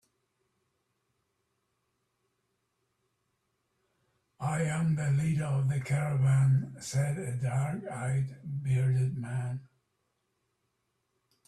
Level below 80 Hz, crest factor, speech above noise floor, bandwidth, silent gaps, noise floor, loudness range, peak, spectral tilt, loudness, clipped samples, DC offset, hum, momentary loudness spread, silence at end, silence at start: -64 dBFS; 14 dB; 50 dB; 12 kHz; none; -80 dBFS; 6 LU; -18 dBFS; -7 dB/octave; -30 LUFS; under 0.1%; under 0.1%; none; 9 LU; 1.8 s; 4.4 s